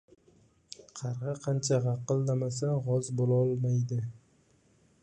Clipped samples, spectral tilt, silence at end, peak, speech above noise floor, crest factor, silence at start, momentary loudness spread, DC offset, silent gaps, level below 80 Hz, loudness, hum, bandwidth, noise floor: under 0.1%; -7 dB/octave; 0.85 s; -16 dBFS; 37 dB; 16 dB; 0.8 s; 13 LU; under 0.1%; none; -68 dBFS; -30 LUFS; none; 9.6 kHz; -66 dBFS